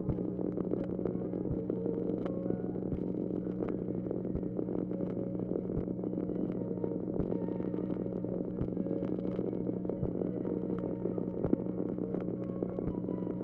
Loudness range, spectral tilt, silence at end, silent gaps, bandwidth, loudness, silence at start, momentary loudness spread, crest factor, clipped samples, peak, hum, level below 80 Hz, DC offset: 1 LU; -12.5 dB/octave; 0 s; none; 3.4 kHz; -36 LUFS; 0 s; 2 LU; 22 dB; under 0.1%; -14 dBFS; none; -54 dBFS; under 0.1%